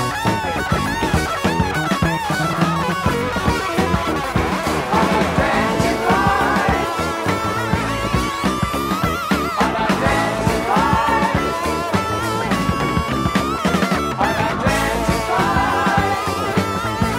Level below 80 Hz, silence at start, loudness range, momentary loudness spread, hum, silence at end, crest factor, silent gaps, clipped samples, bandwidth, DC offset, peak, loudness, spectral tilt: -32 dBFS; 0 s; 2 LU; 4 LU; none; 0 s; 14 dB; none; under 0.1%; 16 kHz; under 0.1%; -4 dBFS; -18 LUFS; -5 dB/octave